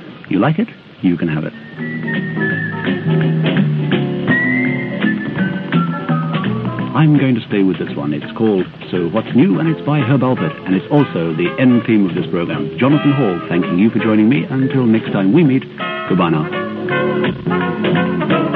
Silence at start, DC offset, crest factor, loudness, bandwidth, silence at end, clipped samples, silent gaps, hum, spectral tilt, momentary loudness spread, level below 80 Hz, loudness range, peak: 0 s; under 0.1%; 16 dB; -16 LUFS; 4.8 kHz; 0 s; under 0.1%; none; none; -10.5 dB/octave; 7 LU; -52 dBFS; 3 LU; 0 dBFS